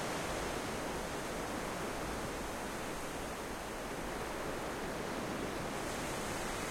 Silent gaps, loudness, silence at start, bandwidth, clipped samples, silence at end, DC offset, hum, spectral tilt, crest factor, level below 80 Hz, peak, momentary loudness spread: none; -40 LUFS; 0 s; 16.5 kHz; under 0.1%; 0 s; under 0.1%; none; -3.5 dB/octave; 14 dB; -52 dBFS; -26 dBFS; 3 LU